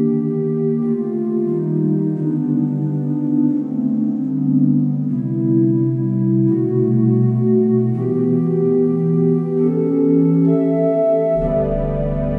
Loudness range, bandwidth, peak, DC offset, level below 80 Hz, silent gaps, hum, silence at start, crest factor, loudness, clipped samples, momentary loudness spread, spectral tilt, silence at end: 3 LU; 3.1 kHz; -4 dBFS; under 0.1%; -38 dBFS; none; none; 0 s; 12 dB; -17 LUFS; under 0.1%; 5 LU; -13 dB/octave; 0 s